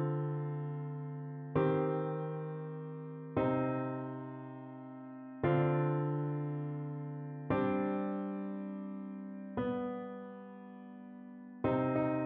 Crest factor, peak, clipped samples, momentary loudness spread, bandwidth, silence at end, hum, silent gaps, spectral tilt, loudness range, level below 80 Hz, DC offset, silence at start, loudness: 18 dB; -18 dBFS; under 0.1%; 16 LU; 3.8 kHz; 0 s; none; none; -8.5 dB/octave; 5 LU; -66 dBFS; under 0.1%; 0 s; -37 LUFS